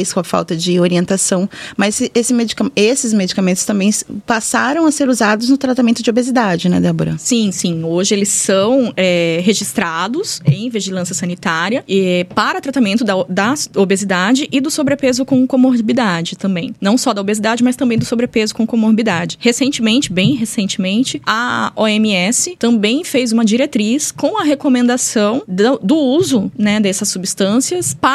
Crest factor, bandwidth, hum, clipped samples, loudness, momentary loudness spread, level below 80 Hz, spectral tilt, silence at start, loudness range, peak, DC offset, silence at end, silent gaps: 14 dB; 15 kHz; none; under 0.1%; -14 LUFS; 4 LU; -54 dBFS; -4 dB/octave; 0 s; 1 LU; 0 dBFS; under 0.1%; 0 s; none